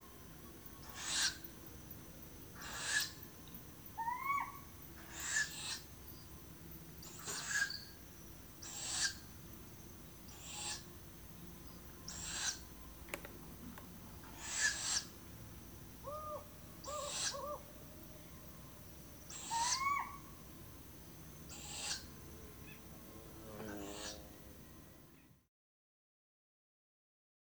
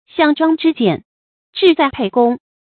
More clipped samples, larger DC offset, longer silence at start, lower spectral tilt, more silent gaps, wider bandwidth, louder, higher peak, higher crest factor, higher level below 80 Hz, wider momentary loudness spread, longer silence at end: neither; neither; second, 0 s vs 0.15 s; second, -1 dB/octave vs -8 dB/octave; second, none vs 1.05-1.53 s; first, over 20 kHz vs 4.6 kHz; second, -43 LUFS vs -15 LUFS; second, -20 dBFS vs 0 dBFS; first, 26 dB vs 16 dB; second, -62 dBFS vs -54 dBFS; first, 17 LU vs 5 LU; first, 2.05 s vs 0.25 s